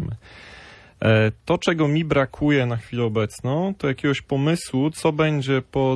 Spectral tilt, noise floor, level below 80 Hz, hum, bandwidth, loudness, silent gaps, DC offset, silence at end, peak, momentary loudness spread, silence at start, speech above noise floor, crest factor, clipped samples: -6.5 dB/octave; -45 dBFS; -48 dBFS; none; 11 kHz; -22 LUFS; none; under 0.1%; 0 s; -4 dBFS; 6 LU; 0 s; 24 dB; 16 dB; under 0.1%